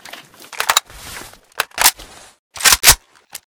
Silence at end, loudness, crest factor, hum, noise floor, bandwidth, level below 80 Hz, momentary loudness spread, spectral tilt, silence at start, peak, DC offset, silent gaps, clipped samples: 0.55 s; -13 LUFS; 18 dB; none; -39 dBFS; over 20 kHz; -38 dBFS; 24 LU; 1 dB/octave; 0.5 s; 0 dBFS; under 0.1%; 2.39-2.50 s; 0.2%